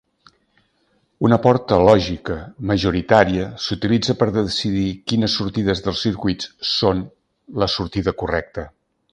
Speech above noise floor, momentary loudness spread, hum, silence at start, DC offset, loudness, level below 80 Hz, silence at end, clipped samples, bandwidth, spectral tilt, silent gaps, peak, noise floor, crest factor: 45 dB; 11 LU; none; 1.2 s; under 0.1%; -19 LUFS; -40 dBFS; 0.45 s; under 0.1%; 10.5 kHz; -6 dB/octave; none; 0 dBFS; -64 dBFS; 20 dB